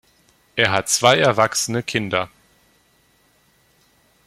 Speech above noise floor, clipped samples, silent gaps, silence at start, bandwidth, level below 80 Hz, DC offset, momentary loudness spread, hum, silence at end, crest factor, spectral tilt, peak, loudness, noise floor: 41 dB; under 0.1%; none; 0.55 s; 16 kHz; -58 dBFS; under 0.1%; 10 LU; none; 2 s; 22 dB; -3 dB/octave; 0 dBFS; -18 LUFS; -59 dBFS